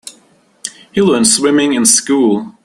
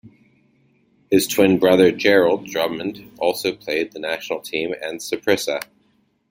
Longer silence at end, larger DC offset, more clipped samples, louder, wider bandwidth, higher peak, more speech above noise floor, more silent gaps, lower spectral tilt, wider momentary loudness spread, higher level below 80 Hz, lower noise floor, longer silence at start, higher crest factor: second, 0.15 s vs 0.65 s; neither; neither; first, -11 LUFS vs -20 LUFS; about the same, 15 kHz vs 16.5 kHz; about the same, 0 dBFS vs -2 dBFS; second, 39 dB vs 44 dB; neither; about the same, -3 dB/octave vs -4 dB/octave; first, 18 LU vs 12 LU; first, -52 dBFS vs -60 dBFS; second, -50 dBFS vs -63 dBFS; about the same, 0.05 s vs 0.05 s; about the same, 14 dB vs 18 dB